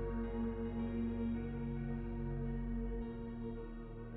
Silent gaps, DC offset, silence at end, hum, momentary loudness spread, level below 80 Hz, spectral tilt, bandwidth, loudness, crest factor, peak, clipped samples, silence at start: none; under 0.1%; 0 s; none; 6 LU; -46 dBFS; -9 dB/octave; 4 kHz; -42 LUFS; 12 dB; -30 dBFS; under 0.1%; 0 s